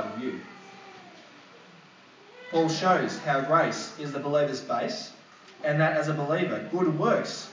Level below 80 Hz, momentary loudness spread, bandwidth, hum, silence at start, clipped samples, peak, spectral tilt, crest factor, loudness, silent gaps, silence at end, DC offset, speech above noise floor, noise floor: -84 dBFS; 22 LU; 7.6 kHz; none; 0 s; under 0.1%; -10 dBFS; -5.5 dB/octave; 18 dB; -27 LUFS; none; 0 s; under 0.1%; 27 dB; -53 dBFS